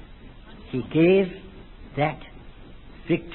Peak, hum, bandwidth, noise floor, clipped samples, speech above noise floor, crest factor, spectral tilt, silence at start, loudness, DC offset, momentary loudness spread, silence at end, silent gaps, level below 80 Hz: -8 dBFS; none; 4.2 kHz; -44 dBFS; under 0.1%; 22 dB; 18 dB; -11.5 dB/octave; 0 s; -24 LUFS; under 0.1%; 27 LU; 0 s; none; -46 dBFS